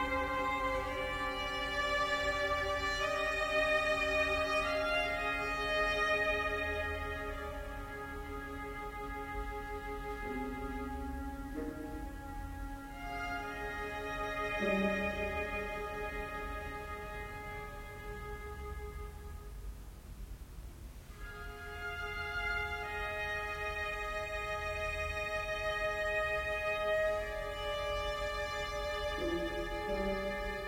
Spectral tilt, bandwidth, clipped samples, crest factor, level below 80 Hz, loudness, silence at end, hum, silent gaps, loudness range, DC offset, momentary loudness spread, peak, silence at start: -4.5 dB/octave; 16 kHz; under 0.1%; 18 dB; -48 dBFS; -36 LUFS; 0 s; none; none; 13 LU; under 0.1%; 14 LU; -20 dBFS; 0 s